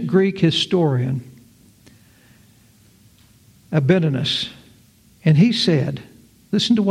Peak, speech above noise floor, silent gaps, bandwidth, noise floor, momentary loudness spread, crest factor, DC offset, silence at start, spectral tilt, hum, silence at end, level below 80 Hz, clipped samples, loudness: -2 dBFS; 35 dB; none; 12 kHz; -52 dBFS; 11 LU; 18 dB; under 0.1%; 0 s; -6.5 dB/octave; none; 0 s; -58 dBFS; under 0.1%; -19 LUFS